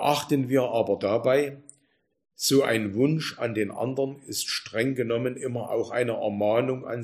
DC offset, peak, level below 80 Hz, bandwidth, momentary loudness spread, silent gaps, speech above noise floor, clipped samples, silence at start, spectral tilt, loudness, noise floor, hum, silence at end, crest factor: under 0.1%; -8 dBFS; -68 dBFS; 15.5 kHz; 7 LU; none; 44 dB; under 0.1%; 0 s; -5 dB/octave; -26 LUFS; -70 dBFS; none; 0 s; 18 dB